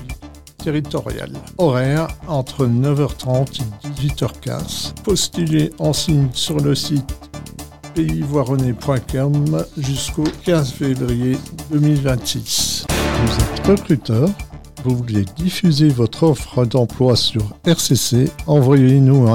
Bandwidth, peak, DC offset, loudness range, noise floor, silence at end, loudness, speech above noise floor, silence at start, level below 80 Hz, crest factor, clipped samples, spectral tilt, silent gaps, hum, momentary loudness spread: 17 kHz; -2 dBFS; 0.4%; 4 LU; -36 dBFS; 0 s; -17 LUFS; 20 dB; 0 s; -34 dBFS; 14 dB; under 0.1%; -5.5 dB/octave; none; none; 10 LU